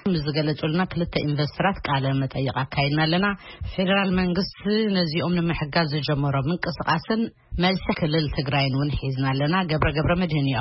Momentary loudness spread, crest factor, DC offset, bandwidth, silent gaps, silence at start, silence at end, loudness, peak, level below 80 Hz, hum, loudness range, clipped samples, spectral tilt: 4 LU; 16 dB; under 0.1%; 5.8 kHz; none; 0.05 s; 0 s; -24 LUFS; -8 dBFS; -40 dBFS; none; 1 LU; under 0.1%; -10 dB/octave